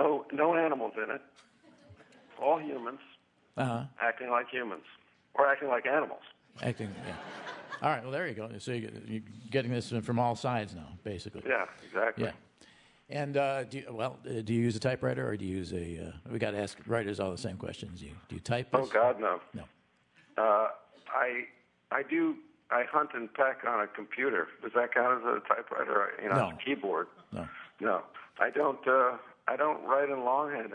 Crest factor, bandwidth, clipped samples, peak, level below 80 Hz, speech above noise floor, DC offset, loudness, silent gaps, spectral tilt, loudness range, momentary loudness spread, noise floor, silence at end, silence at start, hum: 24 dB; 10.5 kHz; under 0.1%; -10 dBFS; -70 dBFS; 34 dB; under 0.1%; -32 LUFS; none; -6.5 dB/octave; 5 LU; 14 LU; -66 dBFS; 0 s; 0 s; none